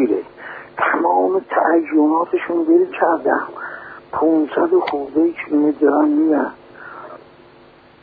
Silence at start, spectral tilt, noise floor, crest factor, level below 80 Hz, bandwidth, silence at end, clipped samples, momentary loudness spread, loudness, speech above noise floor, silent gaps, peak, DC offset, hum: 0 s; -9 dB/octave; -46 dBFS; 16 dB; -62 dBFS; 4.9 kHz; 0.85 s; under 0.1%; 18 LU; -17 LUFS; 30 dB; none; -2 dBFS; under 0.1%; none